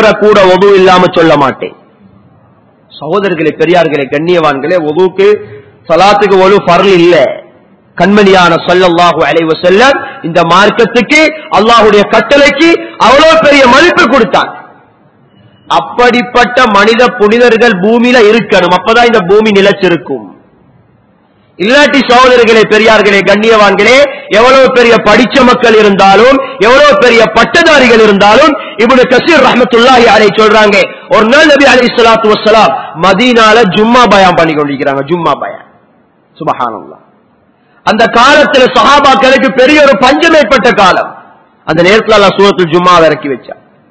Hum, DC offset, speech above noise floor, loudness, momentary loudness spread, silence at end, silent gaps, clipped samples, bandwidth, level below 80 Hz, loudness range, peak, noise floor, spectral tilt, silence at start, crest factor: none; 0.4%; 42 dB; -5 LUFS; 8 LU; 0.35 s; none; 20%; 8 kHz; -38 dBFS; 5 LU; 0 dBFS; -47 dBFS; -4.5 dB/octave; 0 s; 6 dB